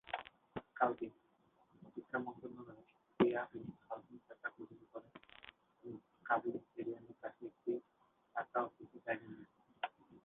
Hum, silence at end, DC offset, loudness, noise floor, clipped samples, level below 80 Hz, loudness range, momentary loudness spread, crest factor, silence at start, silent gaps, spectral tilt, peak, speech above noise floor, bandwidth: none; 0.05 s; under 0.1%; -43 LUFS; -76 dBFS; under 0.1%; -80 dBFS; 4 LU; 19 LU; 26 dB; 0.05 s; none; -4 dB/octave; -18 dBFS; 32 dB; 4 kHz